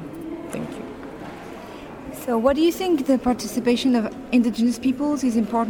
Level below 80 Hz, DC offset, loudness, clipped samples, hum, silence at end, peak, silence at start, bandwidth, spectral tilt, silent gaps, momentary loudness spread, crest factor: -50 dBFS; under 0.1%; -22 LUFS; under 0.1%; none; 0 s; -6 dBFS; 0 s; 18 kHz; -5 dB/octave; none; 17 LU; 16 dB